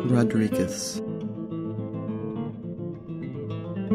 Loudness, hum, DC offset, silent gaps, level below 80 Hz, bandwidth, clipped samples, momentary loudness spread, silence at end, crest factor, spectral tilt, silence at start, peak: -29 LUFS; none; under 0.1%; none; -58 dBFS; 15.5 kHz; under 0.1%; 12 LU; 0 s; 18 dB; -6 dB/octave; 0 s; -10 dBFS